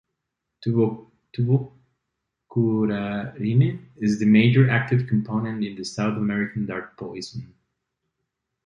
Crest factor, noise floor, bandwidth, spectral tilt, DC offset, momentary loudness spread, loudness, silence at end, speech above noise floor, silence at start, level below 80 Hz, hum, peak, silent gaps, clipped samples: 18 dB; -81 dBFS; 9.6 kHz; -7.5 dB/octave; under 0.1%; 17 LU; -23 LUFS; 1.2 s; 59 dB; 0.6 s; -58 dBFS; none; -4 dBFS; none; under 0.1%